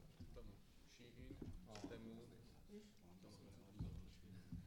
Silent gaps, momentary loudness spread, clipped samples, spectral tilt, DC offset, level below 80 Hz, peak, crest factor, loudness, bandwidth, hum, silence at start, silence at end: none; 11 LU; under 0.1%; -6.5 dB/octave; under 0.1%; -64 dBFS; -38 dBFS; 18 dB; -60 LUFS; 17.5 kHz; none; 0 s; 0 s